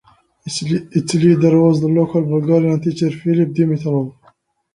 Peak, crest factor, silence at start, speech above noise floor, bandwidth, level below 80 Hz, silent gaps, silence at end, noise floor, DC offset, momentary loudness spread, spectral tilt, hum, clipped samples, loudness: -2 dBFS; 14 dB; 0.45 s; 40 dB; 11.5 kHz; -54 dBFS; none; 0.65 s; -55 dBFS; under 0.1%; 10 LU; -7.5 dB/octave; none; under 0.1%; -16 LUFS